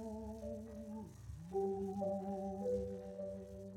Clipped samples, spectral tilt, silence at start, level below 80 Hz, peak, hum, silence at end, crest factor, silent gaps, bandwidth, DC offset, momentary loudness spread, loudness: under 0.1%; -8.5 dB/octave; 0 s; -60 dBFS; -28 dBFS; none; 0 s; 14 dB; none; 15.5 kHz; under 0.1%; 10 LU; -44 LUFS